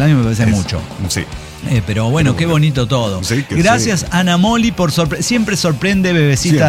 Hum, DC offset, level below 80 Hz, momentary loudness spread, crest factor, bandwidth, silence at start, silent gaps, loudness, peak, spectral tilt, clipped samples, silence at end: none; under 0.1%; -34 dBFS; 7 LU; 12 dB; 16 kHz; 0 s; none; -14 LUFS; -2 dBFS; -5 dB/octave; under 0.1%; 0 s